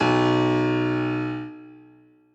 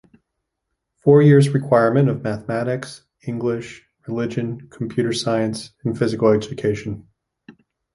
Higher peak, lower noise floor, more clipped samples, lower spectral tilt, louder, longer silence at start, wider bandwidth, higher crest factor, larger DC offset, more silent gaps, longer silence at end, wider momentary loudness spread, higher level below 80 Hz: second, -10 dBFS vs -2 dBFS; second, -54 dBFS vs -78 dBFS; neither; about the same, -7 dB/octave vs -7 dB/octave; second, -23 LUFS vs -19 LUFS; second, 0 s vs 1.05 s; second, 8 kHz vs 11.5 kHz; about the same, 14 dB vs 18 dB; neither; neither; about the same, 0.55 s vs 0.45 s; about the same, 17 LU vs 17 LU; about the same, -58 dBFS vs -54 dBFS